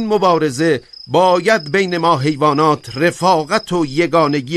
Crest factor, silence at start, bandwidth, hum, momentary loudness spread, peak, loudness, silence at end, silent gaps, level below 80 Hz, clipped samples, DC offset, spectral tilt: 14 dB; 0 s; 13.5 kHz; none; 4 LU; 0 dBFS; -15 LUFS; 0 s; none; -54 dBFS; under 0.1%; under 0.1%; -5.5 dB/octave